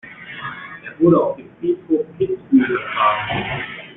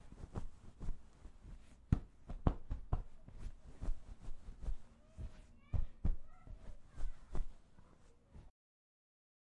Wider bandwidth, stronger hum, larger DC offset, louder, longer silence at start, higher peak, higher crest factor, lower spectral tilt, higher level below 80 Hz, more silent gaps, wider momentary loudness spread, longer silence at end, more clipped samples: second, 4 kHz vs 7.2 kHz; neither; neither; first, -19 LUFS vs -47 LUFS; about the same, 0.05 s vs 0.05 s; first, -2 dBFS vs -14 dBFS; second, 16 dB vs 28 dB; first, -10 dB/octave vs -8.5 dB/octave; second, -52 dBFS vs -46 dBFS; neither; second, 15 LU vs 22 LU; second, 0 s vs 1 s; neither